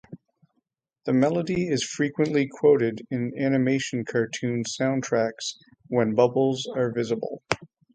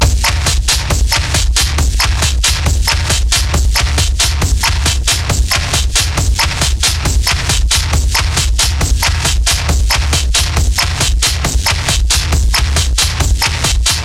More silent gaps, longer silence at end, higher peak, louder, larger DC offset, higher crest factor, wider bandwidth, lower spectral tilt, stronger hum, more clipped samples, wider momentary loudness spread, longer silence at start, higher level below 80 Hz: neither; first, 0.3 s vs 0 s; about the same, -2 dBFS vs 0 dBFS; second, -25 LUFS vs -12 LUFS; neither; first, 22 dB vs 12 dB; second, 9.4 kHz vs 16.5 kHz; first, -5.5 dB/octave vs -2.5 dB/octave; neither; neither; first, 9 LU vs 1 LU; about the same, 0.1 s vs 0 s; second, -64 dBFS vs -14 dBFS